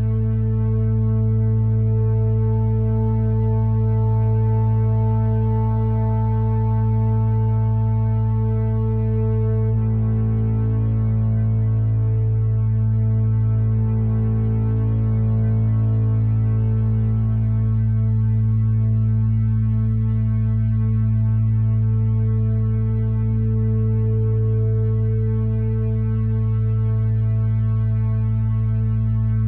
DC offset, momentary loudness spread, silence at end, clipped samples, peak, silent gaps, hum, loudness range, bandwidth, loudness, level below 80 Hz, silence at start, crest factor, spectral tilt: under 0.1%; 2 LU; 0 s; under 0.1%; -10 dBFS; none; none; 1 LU; 2.6 kHz; -20 LUFS; -30 dBFS; 0 s; 8 dB; -13.5 dB/octave